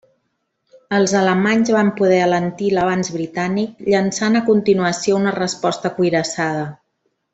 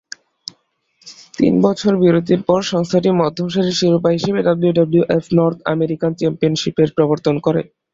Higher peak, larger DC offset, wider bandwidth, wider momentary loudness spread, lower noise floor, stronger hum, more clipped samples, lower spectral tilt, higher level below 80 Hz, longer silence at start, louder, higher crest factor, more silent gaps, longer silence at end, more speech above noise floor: about the same, -2 dBFS vs -2 dBFS; neither; about the same, 8.2 kHz vs 7.8 kHz; about the same, 6 LU vs 5 LU; first, -71 dBFS vs -60 dBFS; neither; neither; second, -5 dB/octave vs -6.5 dB/octave; second, -58 dBFS vs -52 dBFS; second, 0.9 s vs 1.05 s; about the same, -17 LUFS vs -16 LUFS; about the same, 14 dB vs 14 dB; neither; first, 0.6 s vs 0.3 s; first, 54 dB vs 45 dB